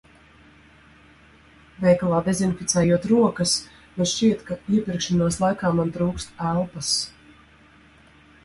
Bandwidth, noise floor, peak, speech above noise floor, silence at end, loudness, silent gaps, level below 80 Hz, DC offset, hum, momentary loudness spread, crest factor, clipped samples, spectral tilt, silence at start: 11.5 kHz; -53 dBFS; -6 dBFS; 31 dB; 1.35 s; -22 LUFS; none; -50 dBFS; under 0.1%; none; 7 LU; 18 dB; under 0.1%; -5 dB/octave; 1.8 s